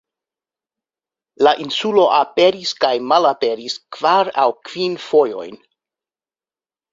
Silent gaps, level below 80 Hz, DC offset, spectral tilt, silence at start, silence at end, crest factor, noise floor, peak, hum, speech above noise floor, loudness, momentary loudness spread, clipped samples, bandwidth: none; -66 dBFS; under 0.1%; -4 dB/octave; 1.4 s; 1.35 s; 18 dB; under -90 dBFS; -2 dBFS; none; over 74 dB; -17 LUFS; 9 LU; under 0.1%; 7.8 kHz